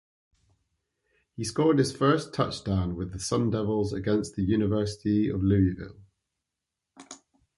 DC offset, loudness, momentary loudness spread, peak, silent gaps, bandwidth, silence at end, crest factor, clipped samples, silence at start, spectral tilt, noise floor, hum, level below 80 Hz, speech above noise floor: under 0.1%; -27 LUFS; 16 LU; -10 dBFS; none; 11.5 kHz; 0.4 s; 18 dB; under 0.1%; 1.4 s; -6.5 dB/octave; -86 dBFS; none; -46 dBFS; 60 dB